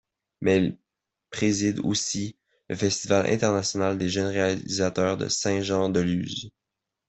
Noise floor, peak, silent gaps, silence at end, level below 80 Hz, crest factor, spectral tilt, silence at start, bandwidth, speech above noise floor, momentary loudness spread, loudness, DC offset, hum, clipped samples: -85 dBFS; -8 dBFS; none; 0.6 s; -60 dBFS; 18 dB; -4.5 dB/octave; 0.4 s; 8.4 kHz; 60 dB; 9 LU; -25 LUFS; under 0.1%; none; under 0.1%